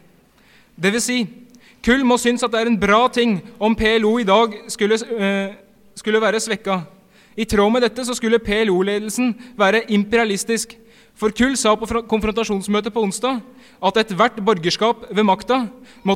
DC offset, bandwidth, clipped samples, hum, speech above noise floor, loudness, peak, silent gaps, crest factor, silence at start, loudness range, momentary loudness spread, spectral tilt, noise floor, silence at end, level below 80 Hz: under 0.1%; 16 kHz; under 0.1%; none; 34 dB; -18 LUFS; -2 dBFS; none; 16 dB; 0.8 s; 3 LU; 8 LU; -4 dB/octave; -52 dBFS; 0 s; -44 dBFS